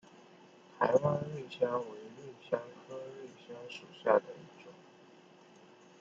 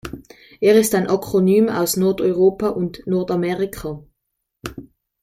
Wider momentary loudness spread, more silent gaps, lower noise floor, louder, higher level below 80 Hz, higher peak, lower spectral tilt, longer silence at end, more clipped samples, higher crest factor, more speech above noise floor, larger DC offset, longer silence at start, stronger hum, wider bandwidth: about the same, 21 LU vs 19 LU; neither; second, -59 dBFS vs -77 dBFS; second, -34 LUFS vs -18 LUFS; second, -80 dBFS vs -48 dBFS; second, -12 dBFS vs -2 dBFS; about the same, -6.5 dB/octave vs -5.5 dB/octave; first, 1.2 s vs 0.4 s; neither; first, 24 dB vs 16 dB; second, 25 dB vs 59 dB; neither; first, 0.75 s vs 0.05 s; neither; second, 7.6 kHz vs 16 kHz